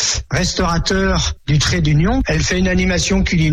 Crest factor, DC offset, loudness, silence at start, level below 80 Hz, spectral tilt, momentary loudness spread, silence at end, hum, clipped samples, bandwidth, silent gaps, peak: 10 dB; under 0.1%; -16 LUFS; 0 s; -24 dBFS; -4.5 dB/octave; 3 LU; 0 s; none; under 0.1%; 11 kHz; none; -6 dBFS